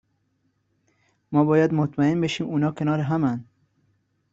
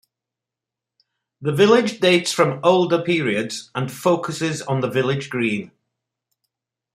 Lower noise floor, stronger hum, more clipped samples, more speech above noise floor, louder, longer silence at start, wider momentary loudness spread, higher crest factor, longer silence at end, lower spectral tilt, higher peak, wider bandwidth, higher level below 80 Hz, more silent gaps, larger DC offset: second, -70 dBFS vs -86 dBFS; neither; neither; second, 49 dB vs 67 dB; second, -23 LUFS vs -19 LUFS; about the same, 1.3 s vs 1.4 s; second, 6 LU vs 11 LU; about the same, 18 dB vs 20 dB; second, 0.9 s vs 1.3 s; first, -7.5 dB/octave vs -5 dB/octave; second, -6 dBFS vs -2 dBFS; second, 7.8 kHz vs 15.5 kHz; about the same, -62 dBFS vs -64 dBFS; neither; neither